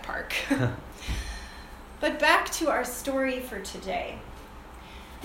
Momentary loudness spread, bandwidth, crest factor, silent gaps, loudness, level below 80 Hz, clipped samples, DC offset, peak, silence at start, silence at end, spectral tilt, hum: 23 LU; 17 kHz; 24 dB; none; -28 LUFS; -44 dBFS; under 0.1%; under 0.1%; -6 dBFS; 0 s; 0 s; -4 dB/octave; none